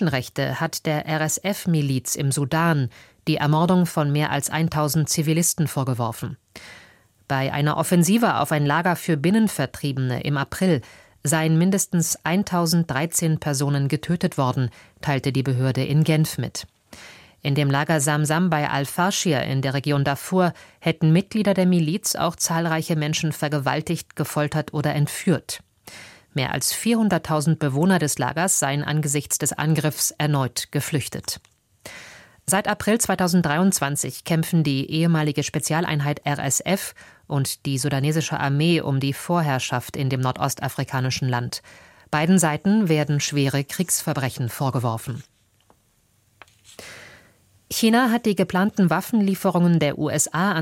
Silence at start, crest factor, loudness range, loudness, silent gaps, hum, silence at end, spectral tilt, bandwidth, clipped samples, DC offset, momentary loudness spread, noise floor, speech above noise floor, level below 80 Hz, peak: 0 s; 16 dB; 3 LU; -22 LUFS; none; none; 0 s; -5 dB/octave; 16.5 kHz; under 0.1%; under 0.1%; 8 LU; -63 dBFS; 41 dB; -56 dBFS; -6 dBFS